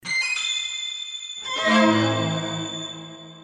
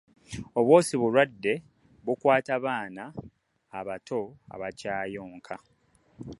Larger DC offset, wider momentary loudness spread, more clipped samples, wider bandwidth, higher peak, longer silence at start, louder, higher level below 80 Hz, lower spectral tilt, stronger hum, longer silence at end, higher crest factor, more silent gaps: neither; second, 14 LU vs 22 LU; neither; about the same, 10.5 kHz vs 11.5 kHz; about the same, -6 dBFS vs -6 dBFS; second, 0.05 s vs 0.3 s; first, -23 LUFS vs -27 LUFS; about the same, -66 dBFS vs -62 dBFS; second, -3.5 dB/octave vs -5.5 dB/octave; neither; about the same, 0 s vs 0.05 s; second, 18 dB vs 24 dB; neither